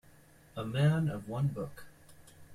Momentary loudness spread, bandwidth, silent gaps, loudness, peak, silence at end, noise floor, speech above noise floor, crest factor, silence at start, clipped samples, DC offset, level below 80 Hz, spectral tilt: 17 LU; 14 kHz; none; -33 LUFS; -16 dBFS; 0 s; -59 dBFS; 28 dB; 18 dB; 0.55 s; under 0.1%; under 0.1%; -62 dBFS; -7.5 dB/octave